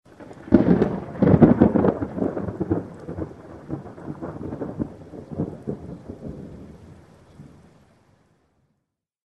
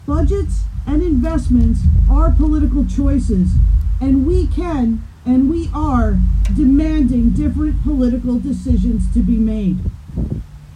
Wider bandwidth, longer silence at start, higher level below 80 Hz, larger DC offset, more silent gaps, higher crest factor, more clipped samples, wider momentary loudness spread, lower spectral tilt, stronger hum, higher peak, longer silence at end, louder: second, 6 kHz vs 9.4 kHz; first, 0.2 s vs 0.05 s; second, -46 dBFS vs -18 dBFS; neither; neither; first, 24 dB vs 10 dB; neither; first, 24 LU vs 6 LU; about the same, -10.5 dB/octave vs -9.5 dB/octave; neither; first, 0 dBFS vs -4 dBFS; first, 1.85 s vs 0 s; second, -22 LUFS vs -16 LUFS